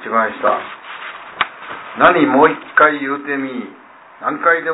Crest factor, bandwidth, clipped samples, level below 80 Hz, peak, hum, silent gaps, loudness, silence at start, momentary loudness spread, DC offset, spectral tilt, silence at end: 16 dB; 4 kHz; under 0.1%; -56 dBFS; 0 dBFS; none; none; -15 LUFS; 0 s; 18 LU; under 0.1%; -8.5 dB/octave; 0 s